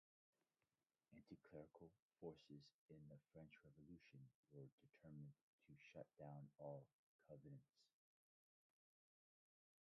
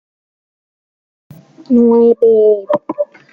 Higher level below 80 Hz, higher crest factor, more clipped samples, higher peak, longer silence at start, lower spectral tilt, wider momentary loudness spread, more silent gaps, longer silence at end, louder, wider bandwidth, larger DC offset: second, -90 dBFS vs -62 dBFS; first, 22 dB vs 12 dB; neither; second, -42 dBFS vs -2 dBFS; second, 1.1 s vs 1.7 s; second, -7 dB/octave vs -9.5 dB/octave; about the same, 9 LU vs 11 LU; first, 2.02-2.10 s, 2.74-2.89 s, 4.35-4.43 s, 4.72-4.78 s, 5.41-5.59 s, 6.93-7.19 s vs none; first, 2.1 s vs 0.3 s; second, -64 LUFS vs -12 LUFS; first, 6 kHz vs 4.7 kHz; neither